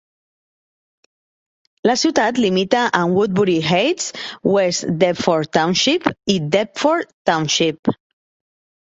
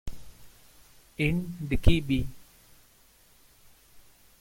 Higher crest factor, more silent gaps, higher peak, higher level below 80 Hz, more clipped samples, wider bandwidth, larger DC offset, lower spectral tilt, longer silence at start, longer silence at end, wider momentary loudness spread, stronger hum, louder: second, 18 dB vs 24 dB; first, 7.14-7.25 s, 7.79-7.83 s vs none; first, -2 dBFS vs -6 dBFS; second, -56 dBFS vs -36 dBFS; neither; second, 8.2 kHz vs 16.5 kHz; neither; second, -4 dB/octave vs -6.5 dB/octave; first, 1.85 s vs 0.05 s; first, 0.9 s vs 0.4 s; second, 5 LU vs 22 LU; neither; first, -17 LUFS vs -29 LUFS